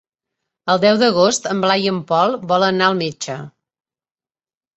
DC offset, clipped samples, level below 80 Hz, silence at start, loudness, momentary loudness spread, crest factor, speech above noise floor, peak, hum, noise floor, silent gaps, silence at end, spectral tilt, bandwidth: under 0.1%; under 0.1%; -62 dBFS; 0.65 s; -16 LUFS; 14 LU; 18 dB; over 74 dB; -2 dBFS; none; under -90 dBFS; none; 1.25 s; -4 dB/octave; 8.2 kHz